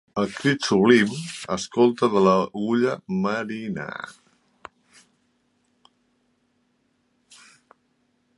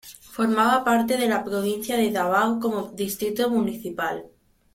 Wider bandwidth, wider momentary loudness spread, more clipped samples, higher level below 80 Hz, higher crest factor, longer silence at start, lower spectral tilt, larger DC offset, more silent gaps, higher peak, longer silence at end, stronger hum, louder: second, 11.5 kHz vs 16.5 kHz; first, 14 LU vs 9 LU; neither; about the same, -64 dBFS vs -62 dBFS; about the same, 22 dB vs 18 dB; about the same, 0.15 s vs 0.05 s; about the same, -5.5 dB/octave vs -4.5 dB/octave; neither; neither; first, -2 dBFS vs -6 dBFS; first, 4.25 s vs 0.5 s; neither; about the same, -22 LUFS vs -23 LUFS